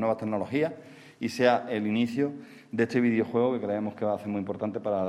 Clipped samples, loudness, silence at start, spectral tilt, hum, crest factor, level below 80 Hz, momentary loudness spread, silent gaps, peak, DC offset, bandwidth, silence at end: under 0.1%; -28 LUFS; 0 s; -6.5 dB/octave; none; 20 dB; -72 dBFS; 9 LU; none; -8 dBFS; under 0.1%; 13 kHz; 0 s